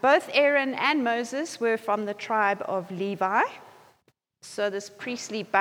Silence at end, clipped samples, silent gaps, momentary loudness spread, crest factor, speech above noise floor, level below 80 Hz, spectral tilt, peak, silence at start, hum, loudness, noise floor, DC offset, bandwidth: 0 s; under 0.1%; none; 12 LU; 18 dB; 43 dB; -82 dBFS; -4 dB/octave; -8 dBFS; 0.05 s; none; -26 LUFS; -68 dBFS; under 0.1%; 16.5 kHz